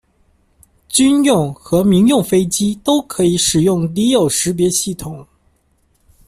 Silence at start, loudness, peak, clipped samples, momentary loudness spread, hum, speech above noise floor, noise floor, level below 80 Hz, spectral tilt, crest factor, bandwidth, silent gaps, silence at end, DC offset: 0.9 s; -14 LUFS; -2 dBFS; under 0.1%; 6 LU; none; 45 dB; -59 dBFS; -44 dBFS; -4.5 dB/octave; 14 dB; 15.5 kHz; none; 1.05 s; under 0.1%